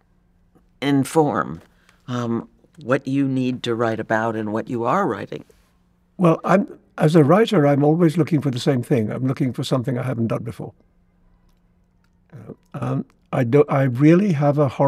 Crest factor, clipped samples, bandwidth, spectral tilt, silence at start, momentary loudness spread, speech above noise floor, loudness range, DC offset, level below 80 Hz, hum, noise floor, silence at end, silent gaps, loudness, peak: 18 dB; under 0.1%; 14.5 kHz; -7.5 dB/octave; 0.8 s; 15 LU; 41 dB; 9 LU; under 0.1%; -60 dBFS; none; -60 dBFS; 0 s; none; -20 LUFS; -2 dBFS